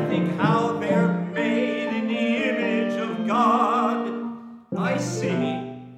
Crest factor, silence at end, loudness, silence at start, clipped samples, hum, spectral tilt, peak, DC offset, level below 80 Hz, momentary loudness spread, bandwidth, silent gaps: 16 dB; 0 s; -23 LUFS; 0 s; under 0.1%; none; -6.5 dB/octave; -6 dBFS; under 0.1%; -70 dBFS; 9 LU; 11 kHz; none